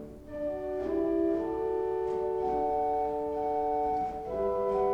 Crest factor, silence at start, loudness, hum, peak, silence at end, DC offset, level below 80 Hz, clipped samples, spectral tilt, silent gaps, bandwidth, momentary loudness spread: 14 dB; 0 s; -31 LUFS; none; -18 dBFS; 0 s; under 0.1%; -52 dBFS; under 0.1%; -8.5 dB/octave; none; 7.8 kHz; 5 LU